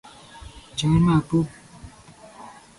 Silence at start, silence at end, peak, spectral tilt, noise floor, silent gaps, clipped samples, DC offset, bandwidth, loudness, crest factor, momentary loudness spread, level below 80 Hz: 0.35 s; 0.3 s; -8 dBFS; -7 dB/octave; -47 dBFS; none; under 0.1%; under 0.1%; 11.5 kHz; -22 LUFS; 18 dB; 25 LU; -44 dBFS